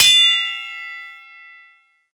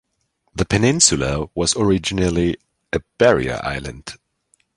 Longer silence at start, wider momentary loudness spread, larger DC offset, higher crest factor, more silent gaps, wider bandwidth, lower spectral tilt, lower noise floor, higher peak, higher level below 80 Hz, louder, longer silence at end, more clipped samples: second, 0 s vs 0.55 s; first, 23 LU vs 18 LU; neither; about the same, 20 dB vs 20 dB; neither; first, 19 kHz vs 16 kHz; second, 3.5 dB/octave vs -4 dB/octave; second, -53 dBFS vs -69 dBFS; about the same, 0 dBFS vs 0 dBFS; second, -64 dBFS vs -38 dBFS; first, -14 LUFS vs -18 LUFS; first, 1 s vs 0.6 s; neither